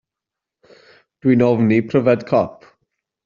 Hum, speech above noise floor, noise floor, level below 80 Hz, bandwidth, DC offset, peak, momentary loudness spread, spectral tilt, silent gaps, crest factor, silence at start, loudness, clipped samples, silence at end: none; 70 dB; -85 dBFS; -58 dBFS; 7 kHz; under 0.1%; -2 dBFS; 6 LU; -7.5 dB/octave; none; 18 dB; 1.25 s; -17 LUFS; under 0.1%; 0.75 s